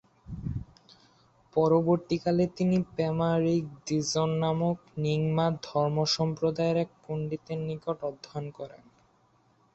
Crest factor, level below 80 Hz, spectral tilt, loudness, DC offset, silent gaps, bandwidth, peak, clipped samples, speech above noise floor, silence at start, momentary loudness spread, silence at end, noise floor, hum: 18 dB; -56 dBFS; -6.5 dB/octave; -29 LUFS; under 0.1%; none; 8.2 kHz; -12 dBFS; under 0.1%; 38 dB; 0.25 s; 12 LU; 1 s; -66 dBFS; none